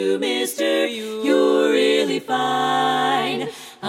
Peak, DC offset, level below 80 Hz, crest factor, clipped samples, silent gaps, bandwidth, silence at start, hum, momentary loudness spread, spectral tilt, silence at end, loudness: -6 dBFS; under 0.1%; -74 dBFS; 14 dB; under 0.1%; none; 16 kHz; 0 s; none; 7 LU; -3.5 dB/octave; 0 s; -19 LUFS